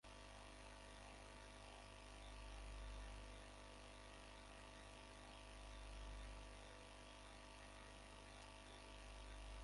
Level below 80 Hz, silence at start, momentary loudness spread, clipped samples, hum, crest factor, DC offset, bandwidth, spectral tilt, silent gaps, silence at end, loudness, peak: -60 dBFS; 0.05 s; 3 LU; under 0.1%; 50 Hz at -60 dBFS; 14 dB; under 0.1%; 11.5 kHz; -3.5 dB/octave; none; 0 s; -59 LUFS; -44 dBFS